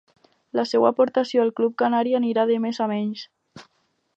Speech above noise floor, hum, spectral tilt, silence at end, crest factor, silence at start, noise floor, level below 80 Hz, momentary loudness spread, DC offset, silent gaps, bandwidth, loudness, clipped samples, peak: 48 dB; none; -6 dB/octave; 0.55 s; 20 dB; 0.55 s; -69 dBFS; -78 dBFS; 10 LU; under 0.1%; none; 8 kHz; -22 LUFS; under 0.1%; -4 dBFS